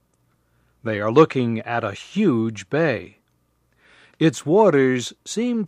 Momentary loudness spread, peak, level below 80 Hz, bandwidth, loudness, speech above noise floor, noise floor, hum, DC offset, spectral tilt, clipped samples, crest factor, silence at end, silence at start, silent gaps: 11 LU; -2 dBFS; -66 dBFS; 13 kHz; -20 LUFS; 46 dB; -66 dBFS; none; under 0.1%; -6 dB/octave; under 0.1%; 20 dB; 0 s; 0.85 s; none